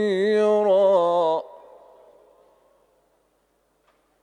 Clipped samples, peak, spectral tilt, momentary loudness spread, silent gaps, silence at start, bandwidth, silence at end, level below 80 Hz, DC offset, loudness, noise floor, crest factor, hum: under 0.1%; -8 dBFS; -6 dB/octave; 9 LU; none; 0 s; 10 kHz; 2.65 s; -76 dBFS; under 0.1%; -20 LUFS; -67 dBFS; 16 dB; none